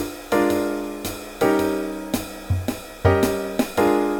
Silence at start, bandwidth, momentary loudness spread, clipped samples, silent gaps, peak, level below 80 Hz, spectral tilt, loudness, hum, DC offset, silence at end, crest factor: 0 s; 18.5 kHz; 9 LU; under 0.1%; none; -4 dBFS; -42 dBFS; -6 dB/octave; -23 LUFS; none; under 0.1%; 0 s; 18 dB